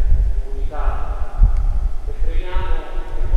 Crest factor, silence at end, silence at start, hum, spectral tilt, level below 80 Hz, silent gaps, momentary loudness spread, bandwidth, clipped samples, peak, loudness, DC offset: 14 dB; 0 s; 0 s; none; -7.5 dB/octave; -16 dBFS; none; 9 LU; 4 kHz; under 0.1%; -2 dBFS; -24 LUFS; under 0.1%